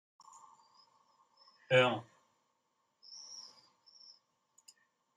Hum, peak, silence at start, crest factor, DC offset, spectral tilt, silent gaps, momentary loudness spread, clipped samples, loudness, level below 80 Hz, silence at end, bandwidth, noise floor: none; -16 dBFS; 1.7 s; 24 dB; under 0.1%; -4.5 dB/octave; none; 29 LU; under 0.1%; -31 LUFS; -84 dBFS; 1.75 s; 9.6 kHz; -81 dBFS